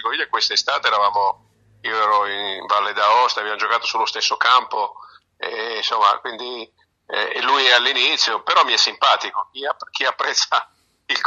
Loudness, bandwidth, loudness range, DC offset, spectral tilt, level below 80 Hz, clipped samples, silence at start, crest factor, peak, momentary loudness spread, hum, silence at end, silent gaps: -18 LUFS; 9 kHz; 4 LU; under 0.1%; 1 dB/octave; -72 dBFS; under 0.1%; 0 s; 20 dB; 0 dBFS; 12 LU; none; 0 s; none